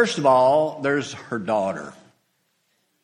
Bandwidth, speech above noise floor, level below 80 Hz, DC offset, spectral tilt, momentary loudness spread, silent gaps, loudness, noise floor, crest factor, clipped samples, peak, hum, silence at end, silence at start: 11 kHz; 49 dB; -66 dBFS; under 0.1%; -5 dB/octave; 14 LU; none; -21 LUFS; -70 dBFS; 18 dB; under 0.1%; -4 dBFS; none; 1.1 s; 0 s